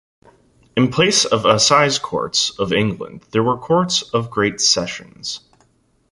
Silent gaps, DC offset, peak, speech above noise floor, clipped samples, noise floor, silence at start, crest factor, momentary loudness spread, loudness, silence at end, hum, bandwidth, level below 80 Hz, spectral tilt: none; under 0.1%; -2 dBFS; 42 dB; under 0.1%; -60 dBFS; 0.75 s; 18 dB; 15 LU; -17 LUFS; 0.75 s; none; 11.5 kHz; -52 dBFS; -3 dB/octave